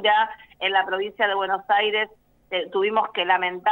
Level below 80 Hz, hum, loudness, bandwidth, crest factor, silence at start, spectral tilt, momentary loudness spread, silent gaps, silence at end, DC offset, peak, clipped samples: -66 dBFS; none; -23 LUFS; 16 kHz; 16 dB; 0 s; -5 dB/octave; 7 LU; none; 0 s; under 0.1%; -6 dBFS; under 0.1%